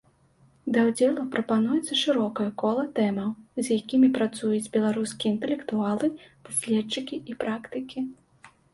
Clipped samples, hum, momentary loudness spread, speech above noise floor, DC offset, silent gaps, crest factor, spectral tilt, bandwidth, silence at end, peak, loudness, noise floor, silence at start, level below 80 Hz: under 0.1%; none; 11 LU; 35 dB; under 0.1%; none; 16 dB; -4.5 dB/octave; 12 kHz; 0.25 s; -10 dBFS; -26 LUFS; -61 dBFS; 0.65 s; -68 dBFS